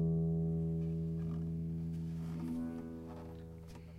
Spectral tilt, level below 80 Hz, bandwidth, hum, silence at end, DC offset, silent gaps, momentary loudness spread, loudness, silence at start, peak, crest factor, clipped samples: -10 dB/octave; -54 dBFS; 4.9 kHz; none; 0 s; under 0.1%; none; 14 LU; -39 LUFS; 0 s; -26 dBFS; 12 dB; under 0.1%